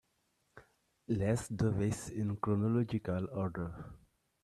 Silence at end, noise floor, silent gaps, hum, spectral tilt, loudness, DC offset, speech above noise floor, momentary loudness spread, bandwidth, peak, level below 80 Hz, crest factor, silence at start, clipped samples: 0.45 s; -78 dBFS; none; none; -7.5 dB/octave; -35 LUFS; under 0.1%; 44 dB; 10 LU; 12.5 kHz; -20 dBFS; -60 dBFS; 18 dB; 0.55 s; under 0.1%